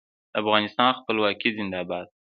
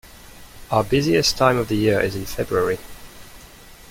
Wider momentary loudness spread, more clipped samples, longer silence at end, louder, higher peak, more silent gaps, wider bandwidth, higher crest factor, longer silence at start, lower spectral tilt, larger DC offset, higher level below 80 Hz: about the same, 9 LU vs 11 LU; neither; about the same, 0.2 s vs 0.15 s; second, -24 LUFS vs -20 LUFS; about the same, -2 dBFS vs -2 dBFS; neither; second, 5.2 kHz vs 16.5 kHz; about the same, 24 dB vs 20 dB; first, 0.35 s vs 0.05 s; first, -7.5 dB/octave vs -4.5 dB/octave; neither; second, -64 dBFS vs -42 dBFS